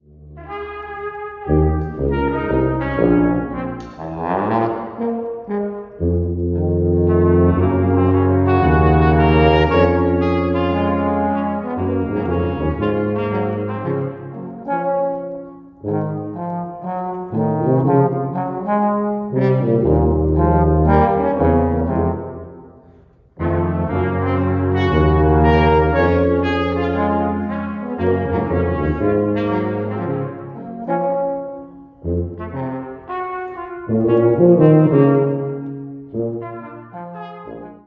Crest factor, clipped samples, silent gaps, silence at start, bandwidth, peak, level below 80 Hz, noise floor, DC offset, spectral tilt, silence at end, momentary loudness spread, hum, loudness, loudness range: 16 dB; under 0.1%; none; 0.2 s; 5.6 kHz; 0 dBFS; -28 dBFS; -48 dBFS; under 0.1%; -10.5 dB/octave; 0.1 s; 16 LU; none; -18 LUFS; 8 LU